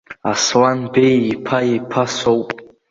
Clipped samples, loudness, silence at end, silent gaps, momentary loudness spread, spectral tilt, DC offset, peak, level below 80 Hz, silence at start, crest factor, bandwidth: under 0.1%; -16 LUFS; 0.25 s; none; 7 LU; -4.5 dB/octave; under 0.1%; -2 dBFS; -54 dBFS; 0.1 s; 16 dB; 7.8 kHz